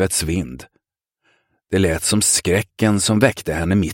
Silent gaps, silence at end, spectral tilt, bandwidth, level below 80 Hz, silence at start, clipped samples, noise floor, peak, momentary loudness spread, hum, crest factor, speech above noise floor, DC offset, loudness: none; 0 s; -4 dB/octave; 17 kHz; -40 dBFS; 0 s; under 0.1%; -72 dBFS; -2 dBFS; 9 LU; none; 18 dB; 54 dB; under 0.1%; -18 LUFS